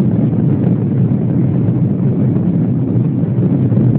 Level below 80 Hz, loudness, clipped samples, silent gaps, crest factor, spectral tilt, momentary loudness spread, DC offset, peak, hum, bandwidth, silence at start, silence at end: -40 dBFS; -14 LUFS; under 0.1%; none; 12 dB; -15 dB/octave; 1 LU; under 0.1%; -2 dBFS; none; 3.2 kHz; 0 s; 0 s